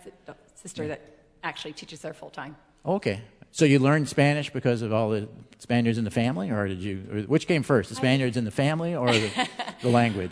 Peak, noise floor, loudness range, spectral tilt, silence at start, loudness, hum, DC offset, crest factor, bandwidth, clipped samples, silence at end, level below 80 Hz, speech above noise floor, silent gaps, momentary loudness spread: -6 dBFS; -48 dBFS; 6 LU; -6 dB/octave; 0.05 s; -25 LUFS; none; under 0.1%; 20 dB; 11 kHz; under 0.1%; 0 s; -60 dBFS; 23 dB; none; 17 LU